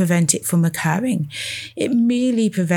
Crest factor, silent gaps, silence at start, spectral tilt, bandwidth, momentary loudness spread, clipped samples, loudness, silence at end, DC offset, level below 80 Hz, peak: 18 dB; none; 0 s; -5 dB/octave; 19 kHz; 8 LU; under 0.1%; -19 LUFS; 0 s; under 0.1%; -64 dBFS; 0 dBFS